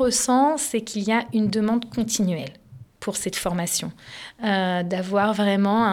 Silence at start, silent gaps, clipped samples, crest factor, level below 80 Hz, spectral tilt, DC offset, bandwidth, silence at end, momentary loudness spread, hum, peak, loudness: 0 s; none; under 0.1%; 14 dB; -54 dBFS; -4 dB/octave; under 0.1%; 17 kHz; 0 s; 11 LU; none; -8 dBFS; -23 LUFS